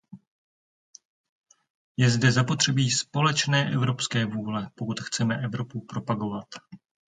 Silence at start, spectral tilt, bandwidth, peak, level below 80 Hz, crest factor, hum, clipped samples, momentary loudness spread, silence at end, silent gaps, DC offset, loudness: 0.15 s; -4.5 dB/octave; 9.4 kHz; -8 dBFS; -62 dBFS; 20 dB; none; under 0.1%; 12 LU; 0.4 s; 0.27-0.94 s, 1.05-1.44 s, 1.70-1.95 s; under 0.1%; -25 LUFS